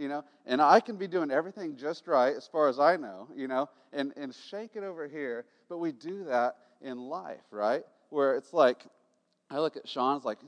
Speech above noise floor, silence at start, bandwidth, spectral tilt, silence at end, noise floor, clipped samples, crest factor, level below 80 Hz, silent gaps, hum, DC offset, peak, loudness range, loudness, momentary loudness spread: 43 dB; 0 s; 10 kHz; -5.5 dB/octave; 0 s; -73 dBFS; under 0.1%; 22 dB; under -90 dBFS; none; none; under 0.1%; -8 dBFS; 8 LU; -30 LUFS; 16 LU